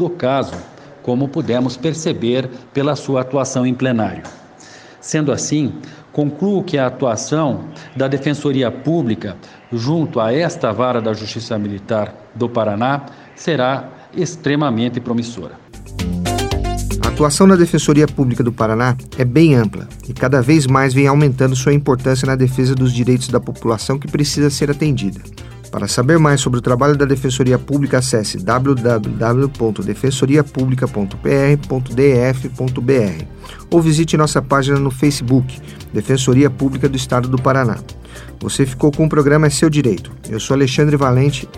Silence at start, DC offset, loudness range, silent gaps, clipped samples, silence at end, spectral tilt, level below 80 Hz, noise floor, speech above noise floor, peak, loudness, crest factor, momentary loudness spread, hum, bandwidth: 0 s; under 0.1%; 6 LU; none; under 0.1%; 0 s; -6 dB/octave; -36 dBFS; -40 dBFS; 25 dB; 0 dBFS; -16 LUFS; 16 dB; 12 LU; none; 14.5 kHz